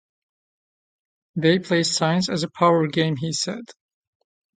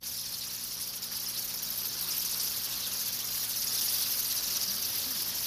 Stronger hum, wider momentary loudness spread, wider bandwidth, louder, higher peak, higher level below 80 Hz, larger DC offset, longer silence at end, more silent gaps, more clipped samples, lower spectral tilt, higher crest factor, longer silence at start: second, none vs 60 Hz at -55 dBFS; about the same, 8 LU vs 7 LU; second, 9.4 kHz vs 16 kHz; first, -21 LUFS vs -30 LUFS; first, -2 dBFS vs -18 dBFS; about the same, -66 dBFS vs -64 dBFS; neither; first, 0.85 s vs 0 s; neither; neither; first, -4.5 dB/octave vs 1 dB/octave; first, 22 dB vs 16 dB; first, 1.35 s vs 0 s